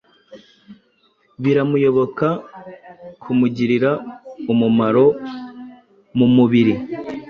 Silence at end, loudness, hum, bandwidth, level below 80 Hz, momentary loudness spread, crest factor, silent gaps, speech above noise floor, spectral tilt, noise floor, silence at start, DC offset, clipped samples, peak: 0 s; -17 LUFS; none; 6.4 kHz; -56 dBFS; 23 LU; 16 dB; none; 44 dB; -9 dB/octave; -60 dBFS; 0.3 s; under 0.1%; under 0.1%; -4 dBFS